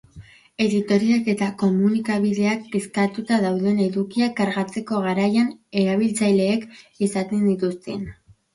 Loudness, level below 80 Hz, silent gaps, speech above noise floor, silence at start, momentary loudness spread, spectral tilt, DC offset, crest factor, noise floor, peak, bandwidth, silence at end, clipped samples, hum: -22 LUFS; -58 dBFS; none; 25 dB; 0.15 s; 7 LU; -6 dB/octave; under 0.1%; 16 dB; -46 dBFS; -6 dBFS; 11.5 kHz; 0.4 s; under 0.1%; none